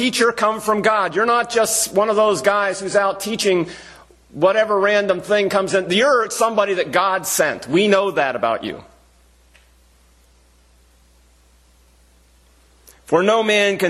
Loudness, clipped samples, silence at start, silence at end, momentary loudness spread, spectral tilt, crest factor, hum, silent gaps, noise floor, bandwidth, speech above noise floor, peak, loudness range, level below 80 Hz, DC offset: -17 LUFS; under 0.1%; 0 s; 0 s; 5 LU; -3 dB/octave; 18 dB; none; none; -53 dBFS; 14.5 kHz; 36 dB; 0 dBFS; 8 LU; -56 dBFS; under 0.1%